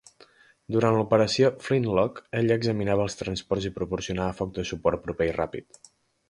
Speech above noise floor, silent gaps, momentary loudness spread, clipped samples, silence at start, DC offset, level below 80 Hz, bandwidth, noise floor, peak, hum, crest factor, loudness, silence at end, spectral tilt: 31 dB; none; 9 LU; under 0.1%; 0.7 s; under 0.1%; -50 dBFS; 11.5 kHz; -57 dBFS; -6 dBFS; none; 20 dB; -26 LUFS; 0.7 s; -6 dB/octave